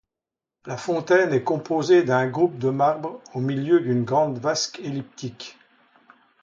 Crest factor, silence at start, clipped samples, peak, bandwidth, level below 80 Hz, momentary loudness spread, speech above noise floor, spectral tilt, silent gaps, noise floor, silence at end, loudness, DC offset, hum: 18 dB; 0.65 s; under 0.1%; -6 dBFS; 7.6 kHz; -68 dBFS; 16 LU; 66 dB; -5.5 dB/octave; none; -88 dBFS; 0.9 s; -22 LUFS; under 0.1%; none